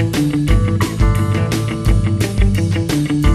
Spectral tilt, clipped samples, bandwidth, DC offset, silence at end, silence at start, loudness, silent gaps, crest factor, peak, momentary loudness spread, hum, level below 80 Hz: -6.5 dB/octave; under 0.1%; 14 kHz; under 0.1%; 0 s; 0 s; -16 LUFS; none; 14 dB; -2 dBFS; 2 LU; none; -20 dBFS